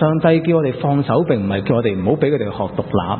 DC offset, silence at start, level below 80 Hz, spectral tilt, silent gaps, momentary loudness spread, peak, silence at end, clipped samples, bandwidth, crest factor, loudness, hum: under 0.1%; 0 s; -48 dBFS; -13 dB/octave; none; 6 LU; -2 dBFS; 0 s; under 0.1%; 4.4 kHz; 16 dB; -17 LUFS; none